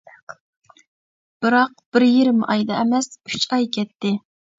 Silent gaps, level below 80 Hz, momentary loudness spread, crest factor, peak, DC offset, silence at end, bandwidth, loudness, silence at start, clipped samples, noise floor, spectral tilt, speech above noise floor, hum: 0.40-0.62 s, 0.88-1.40 s, 1.86-1.92 s; -68 dBFS; 9 LU; 18 dB; -2 dBFS; under 0.1%; 0.4 s; 7.8 kHz; -19 LUFS; 0.3 s; under 0.1%; under -90 dBFS; -4.5 dB/octave; over 71 dB; none